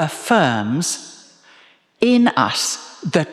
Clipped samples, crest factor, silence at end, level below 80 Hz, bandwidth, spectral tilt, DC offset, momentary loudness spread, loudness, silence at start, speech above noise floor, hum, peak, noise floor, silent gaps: under 0.1%; 18 dB; 0 s; -64 dBFS; 14 kHz; -4 dB/octave; under 0.1%; 11 LU; -18 LUFS; 0 s; 34 dB; none; -2 dBFS; -51 dBFS; none